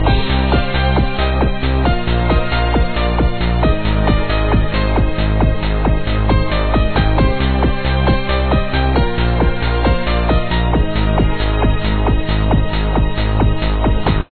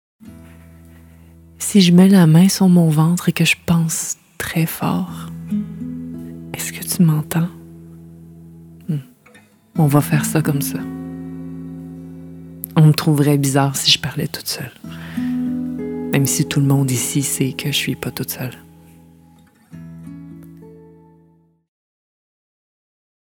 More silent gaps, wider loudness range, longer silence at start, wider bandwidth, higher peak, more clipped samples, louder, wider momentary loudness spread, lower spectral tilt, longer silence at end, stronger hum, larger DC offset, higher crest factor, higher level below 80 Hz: neither; second, 1 LU vs 9 LU; second, 0 s vs 0.25 s; second, 4.5 kHz vs 20 kHz; about the same, -2 dBFS vs 0 dBFS; neither; about the same, -16 LUFS vs -17 LUFS; second, 2 LU vs 20 LU; first, -10 dB/octave vs -5 dB/octave; second, 0 s vs 2.6 s; neither; first, 3% vs under 0.1%; second, 12 dB vs 18 dB; first, -16 dBFS vs -52 dBFS